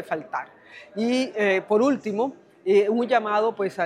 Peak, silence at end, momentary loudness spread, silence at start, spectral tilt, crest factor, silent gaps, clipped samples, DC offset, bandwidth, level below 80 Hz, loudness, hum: -6 dBFS; 0 s; 12 LU; 0 s; -5.5 dB/octave; 16 dB; none; under 0.1%; under 0.1%; 11 kHz; -78 dBFS; -23 LUFS; none